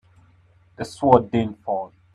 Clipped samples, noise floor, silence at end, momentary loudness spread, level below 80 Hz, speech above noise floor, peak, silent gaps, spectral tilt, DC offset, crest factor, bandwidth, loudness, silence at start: under 0.1%; -56 dBFS; 0.25 s; 16 LU; -54 dBFS; 35 dB; 0 dBFS; none; -7.5 dB/octave; under 0.1%; 22 dB; 11.5 kHz; -21 LUFS; 0.8 s